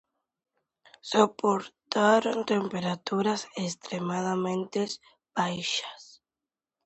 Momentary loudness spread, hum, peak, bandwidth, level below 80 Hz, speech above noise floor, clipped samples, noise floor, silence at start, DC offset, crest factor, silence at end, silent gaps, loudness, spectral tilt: 11 LU; none; -6 dBFS; 8.2 kHz; -74 dBFS; over 62 dB; under 0.1%; under -90 dBFS; 1.05 s; under 0.1%; 24 dB; 0.8 s; none; -28 LUFS; -4.5 dB/octave